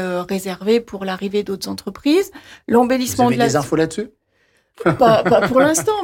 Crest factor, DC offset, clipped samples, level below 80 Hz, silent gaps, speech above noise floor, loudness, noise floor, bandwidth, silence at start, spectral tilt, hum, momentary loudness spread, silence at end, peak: 14 dB; under 0.1%; under 0.1%; -50 dBFS; none; 44 dB; -17 LUFS; -61 dBFS; 17 kHz; 0 s; -5 dB/octave; none; 12 LU; 0 s; -4 dBFS